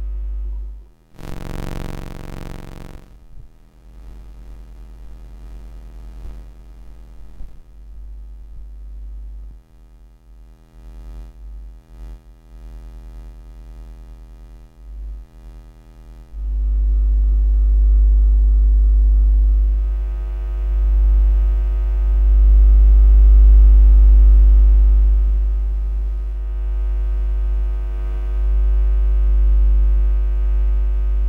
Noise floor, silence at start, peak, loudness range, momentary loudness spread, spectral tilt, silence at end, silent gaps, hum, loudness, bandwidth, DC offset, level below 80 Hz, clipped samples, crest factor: -44 dBFS; 0 s; -4 dBFS; 26 LU; 26 LU; -9 dB/octave; 0 s; none; none; -17 LUFS; 2 kHz; under 0.1%; -16 dBFS; under 0.1%; 12 dB